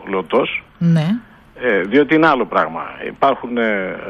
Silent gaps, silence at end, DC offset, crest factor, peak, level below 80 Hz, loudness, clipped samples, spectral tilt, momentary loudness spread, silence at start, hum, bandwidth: none; 0 s; under 0.1%; 16 dB; -2 dBFS; -52 dBFS; -17 LUFS; under 0.1%; -8 dB/octave; 9 LU; 0 s; none; 6.6 kHz